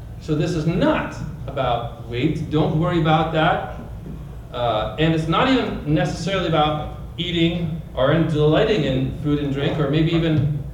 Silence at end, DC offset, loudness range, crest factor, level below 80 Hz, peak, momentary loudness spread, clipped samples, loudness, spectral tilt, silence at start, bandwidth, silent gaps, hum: 0 s; under 0.1%; 2 LU; 16 dB; -36 dBFS; -6 dBFS; 11 LU; under 0.1%; -20 LUFS; -7 dB/octave; 0 s; 10.5 kHz; none; none